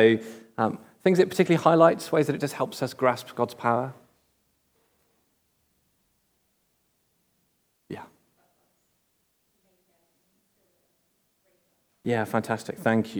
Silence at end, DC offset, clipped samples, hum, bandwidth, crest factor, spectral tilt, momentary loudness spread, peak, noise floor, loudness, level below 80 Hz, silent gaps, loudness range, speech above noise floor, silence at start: 0 s; under 0.1%; under 0.1%; none; over 20 kHz; 24 dB; -6.5 dB/octave; 17 LU; -4 dBFS; -72 dBFS; -25 LUFS; -78 dBFS; none; 12 LU; 48 dB; 0 s